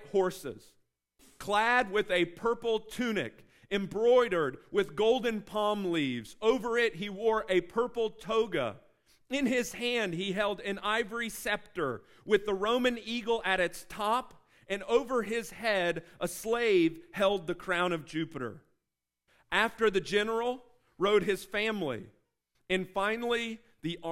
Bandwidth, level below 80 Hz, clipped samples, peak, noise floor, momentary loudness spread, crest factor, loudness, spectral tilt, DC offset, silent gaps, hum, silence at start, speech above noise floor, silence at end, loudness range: 16 kHz; -60 dBFS; under 0.1%; -12 dBFS; -87 dBFS; 9 LU; 20 dB; -31 LUFS; -4.5 dB/octave; under 0.1%; none; none; 0 s; 56 dB; 0 s; 3 LU